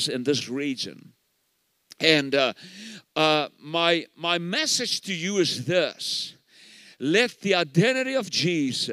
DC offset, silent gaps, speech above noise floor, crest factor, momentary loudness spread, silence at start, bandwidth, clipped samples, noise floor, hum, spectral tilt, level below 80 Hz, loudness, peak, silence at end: under 0.1%; none; 47 dB; 24 dB; 11 LU; 0 s; 15.5 kHz; under 0.1%; -71 dBFS; none; -3.5 dB/octave; -78 dBFS; -24 LUFS; -2 dBFS; 0 s